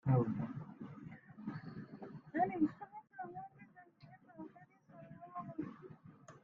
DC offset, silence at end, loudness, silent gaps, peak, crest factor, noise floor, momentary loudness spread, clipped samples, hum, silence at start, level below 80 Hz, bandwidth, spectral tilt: under 0.1%; 0.05 s; -42 LUFS; none; -22 dBFS; 22 dB; -62 dBFS; 25 LU; under 0.1%; none; 0.05 s; -74 dBFS; 6.8 kHz; -9.5 dB/octave